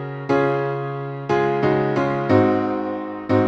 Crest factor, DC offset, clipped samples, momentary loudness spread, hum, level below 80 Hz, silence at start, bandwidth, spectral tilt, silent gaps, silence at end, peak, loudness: 16 dB; under 0.1%; under 0.1%; 10 LU; none; -54 dBFS; 0 s; 7.4 kHz; -8.5 dB/octave; none; 0 s; -4 dBFS; -21 LUFS